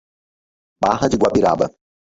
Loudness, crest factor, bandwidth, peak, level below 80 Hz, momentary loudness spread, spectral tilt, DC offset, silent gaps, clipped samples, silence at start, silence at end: -18 LUFS; 18 dB; 8 kHz; -2 dBFS; -46 dBFS; 6 LU; -6 dB/octave; under 0.1%; none; under 0.1%; 0.8 s; 0.5 s